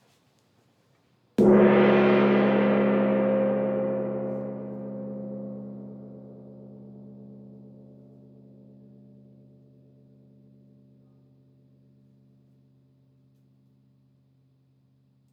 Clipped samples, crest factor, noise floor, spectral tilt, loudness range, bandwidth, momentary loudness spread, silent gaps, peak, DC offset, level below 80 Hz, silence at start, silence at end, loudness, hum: under 0.1%; 20 dB; -65 dBFS; -9 dB/octave; 25 LU; 5 kHz; 28 LU; none; -8 dBFS; under 0.1%; -64 dBFS; 1.4 s; 7.65 s; -23 LUFS; none